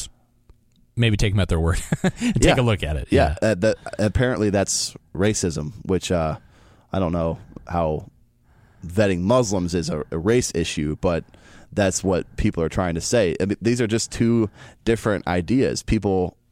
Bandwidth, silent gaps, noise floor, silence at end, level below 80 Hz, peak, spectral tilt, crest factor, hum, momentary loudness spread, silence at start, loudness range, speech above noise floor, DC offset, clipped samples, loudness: 16 kHz; none; -56 dBFS; 0.2 s; -36 dBFS; -2 dBFS; -5.5 dB/octave; 20 dB; none; 8 LU; 0 s; 4 LU; 35 dB; under 0.1%; under 0.1%; -22 LUFS